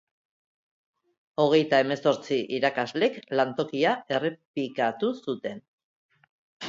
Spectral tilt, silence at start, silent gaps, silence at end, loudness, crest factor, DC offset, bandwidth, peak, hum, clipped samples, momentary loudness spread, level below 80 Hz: -5.5 dB/octave; 1.4 s; 4.45-4.54 s, 5.68-5.78 s, 5.84-6.09 s, 6.30-6.60 s; 0 s; -26 LUFS; 20 dB; under 0.1%; 7.6 kHz; -8 dBFS; none; under 0.1%; 11 LU; -76 dBFS